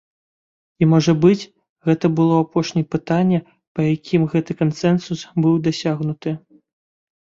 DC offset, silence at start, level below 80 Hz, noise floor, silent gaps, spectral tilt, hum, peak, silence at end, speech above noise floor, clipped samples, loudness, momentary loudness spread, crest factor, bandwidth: under 0.1%; 0.8 s; -56 dBFS; under -90 dBFS; 1.69-1.76 s, 3.67-3.75 s; -7.5 dB/octave; none; -2 dBFS; 0.85 s; over 72 dB; under 0.1%; -19 LUFS; 10 LU; 16 dB; 7.6 kHz